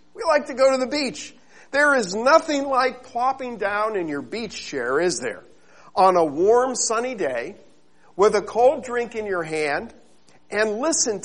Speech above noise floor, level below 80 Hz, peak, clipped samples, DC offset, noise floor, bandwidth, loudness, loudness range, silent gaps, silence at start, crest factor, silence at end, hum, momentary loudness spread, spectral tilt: 36 dB; -60 dBFS; -2 dBFS; under 0.1%; 0.3%; -57 dBFS; 11 kHz; -21 LUFS; 3 LU; none; 0.15 s; 20 dB; 0 s; none; 12 LU; -2.5 dB/octave